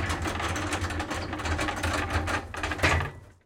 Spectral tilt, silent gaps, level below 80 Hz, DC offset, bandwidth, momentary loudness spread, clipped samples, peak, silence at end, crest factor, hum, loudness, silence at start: -4.5 dB/octave; none; -40 dBFS; under 0.1%; 16.5 kHz; 7 LU; under 0.1%; -10 dBFS; 0.15 s; 20 dB; none; -29 LUFS; 0 s